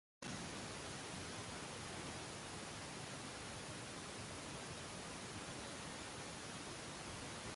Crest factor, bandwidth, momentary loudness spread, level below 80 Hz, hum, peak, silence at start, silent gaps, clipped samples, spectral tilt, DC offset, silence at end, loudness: 14 dB; 11.5 kHz; 1 LU; -66 dBFS; none; -34 dBFS; 0.2 s; none; under 0.1%; -3 dB/octave; under 0.1%; 0 s; -48 LUFS